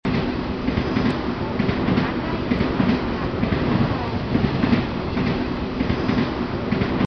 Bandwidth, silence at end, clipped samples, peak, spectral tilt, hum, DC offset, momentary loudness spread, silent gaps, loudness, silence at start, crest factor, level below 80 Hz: 6.4 kHz; 0 s; under 0.1%; -6 dBFS; -8 dB/octave; none; 0.2%; 4 LU; none; -22 LUFS; 0.05 s; 16 dB; -34 dBFS